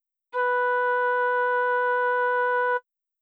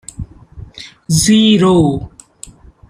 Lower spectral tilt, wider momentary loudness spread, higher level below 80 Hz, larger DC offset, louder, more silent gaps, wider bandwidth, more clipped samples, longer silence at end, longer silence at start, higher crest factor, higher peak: second, -0.5 dB/octave vs -5 dB/octave; second, 4 LU vs 23 LU; second, under -90 dBFS vs -38 dBFS; neither; second, -24 LUFS vs -11 LUFS; neither; second, 4.7 kHz vs 15.5 kHz; neither; about the same, 0.4 s vs 0.4 s; first, 0.35 s vs 0.2 s; about the same, 10 dB vs 14 dB; second, -16 dBFS vs 0 dBFS